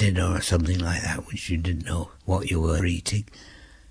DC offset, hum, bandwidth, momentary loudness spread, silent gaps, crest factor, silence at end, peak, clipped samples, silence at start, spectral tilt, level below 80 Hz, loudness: under 0.1%; none; 11 kHz; 8 LU; none; 16 dB; 0.25 s; -10 dBFS; under 0.1%; 0 s; -5 dB/octave; -36 dBFS; -26 LUFS